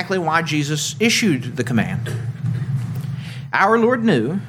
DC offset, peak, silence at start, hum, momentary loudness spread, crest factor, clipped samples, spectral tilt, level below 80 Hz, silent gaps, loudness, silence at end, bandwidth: under 0.1%; -2 dBFS; 0 s; none; 11 LU; 18 dB; under 0.1%; -5 dB/octave; -56 dBFS; none; -19 LUFS; 0 s; 16.5 kHz